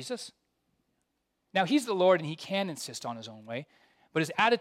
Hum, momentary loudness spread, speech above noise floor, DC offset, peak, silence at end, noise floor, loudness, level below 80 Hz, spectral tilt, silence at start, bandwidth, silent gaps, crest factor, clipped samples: none; 15 LU; 50 dB; under 0.1%; -12 dBFS; 0 s; -80 dBFS; -30 LUFS; -82 dBFS; -4.5 dB/octave; 0 s; 15.5 kHz; none; 20 dB; under 0.1%